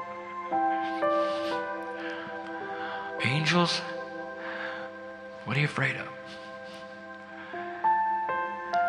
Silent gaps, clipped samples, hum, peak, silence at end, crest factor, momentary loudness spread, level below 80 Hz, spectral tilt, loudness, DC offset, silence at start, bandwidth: none; under 0.1%; none; -10 dBFS; 0 s; 20 dB; 16 LU; -72 dBFS; -5 dB/octave; -30 LUFS; under 0.1%; 0 s; 11.5 kHz